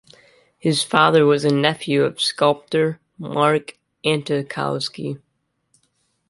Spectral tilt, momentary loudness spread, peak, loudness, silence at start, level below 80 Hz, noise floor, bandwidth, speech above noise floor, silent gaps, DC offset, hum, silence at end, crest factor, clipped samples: -5 dB/octave; 13 LU; -2 dBFS; -19 LUFS; 0.65 s; -64 dBFS; -68 dBFS; 11.5 kHz; 49 dB; none; under 0.1%; none; 1.15 s; 20 dB; under 0.1%